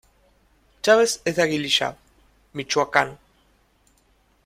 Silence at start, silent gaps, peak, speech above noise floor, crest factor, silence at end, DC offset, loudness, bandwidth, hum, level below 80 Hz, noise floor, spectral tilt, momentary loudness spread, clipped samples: 0.85 s; none; -2 dBFS; 41 dB; 24 dB; 1.3 s; under 0.1%; -21 LUFS; 16 kHz; none; -60 dBFS; -62 dBFS; -3 dB/octave; 12 LU; under 0.1%